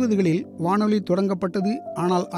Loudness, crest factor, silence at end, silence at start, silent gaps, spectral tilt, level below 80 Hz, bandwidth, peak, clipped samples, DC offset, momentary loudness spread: -23 LUFS; 14 dB; 0 s; 0 s; none; -7.5 dB/octave; -66 dBFS; 11.5 kHz; -8 dBFS; under 0.1%; under 0.1%; 5 LU